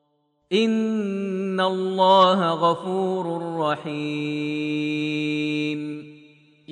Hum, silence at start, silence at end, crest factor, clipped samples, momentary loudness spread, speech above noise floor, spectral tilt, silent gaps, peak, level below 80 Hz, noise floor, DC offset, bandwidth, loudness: none; 0.5 s; 0 s; 18 dB; under 0.1%; 10 LU; 46 dB; -6 dB/octave; none; -4 dBFS; -74 dBFS; -69 dBFS; under 0.1%; 10 kHz; -23 LUFS